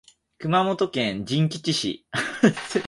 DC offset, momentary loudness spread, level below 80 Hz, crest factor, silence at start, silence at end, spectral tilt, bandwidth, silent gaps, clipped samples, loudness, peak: under 0.1%; 7 LU; -60 dBFS; 20 dB; 0.4 s; 0 s; -5 dB/octave; 11.5 kHz; none; under 0.1%; -24 LUFS; -4 dBFS